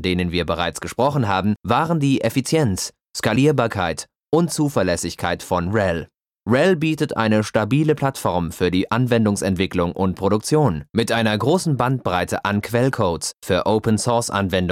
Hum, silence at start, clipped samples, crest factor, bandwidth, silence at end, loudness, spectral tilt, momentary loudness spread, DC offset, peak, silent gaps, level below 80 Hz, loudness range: none; 0 s; under 0.1%; 16 dB; 16.5 kHz; 0 s; -20 LUFS; -5.5 dB/octave; 5 LU; under 0.1%; -4 dBFS; none; -46 dBFS; 1 LU